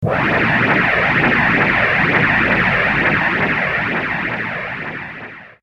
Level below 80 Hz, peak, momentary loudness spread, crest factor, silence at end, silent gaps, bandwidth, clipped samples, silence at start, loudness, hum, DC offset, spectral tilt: -40 dBFS; -2 dBFS; 12 LU; 14 dB; 0.15 s; none; 13 kHz; under 0.1%; 0 s; -15 LUFS; none; under 0.1%; -6.5 dB/octave